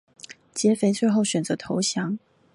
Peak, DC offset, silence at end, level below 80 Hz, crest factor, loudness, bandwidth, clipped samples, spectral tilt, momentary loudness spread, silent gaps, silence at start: -8 dBFS; under 0.1%; 0.35 s; -66 dBFS; 16 dB; -24 LUFS; 11.5 kHz; under 0.1%; -4.5 dB/octave; 14 LU; none; 0.3 s